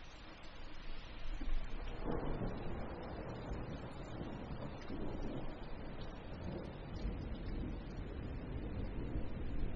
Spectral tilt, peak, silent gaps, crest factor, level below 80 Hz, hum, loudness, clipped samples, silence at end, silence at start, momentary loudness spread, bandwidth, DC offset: -6.5 dB/octave; -24 dBFS; none; 18 dB; -46 dBFS; none; -47 LUFS; under 0.1%; 0 s; 0 s; 8 LU; 7 kHz; under 0.1%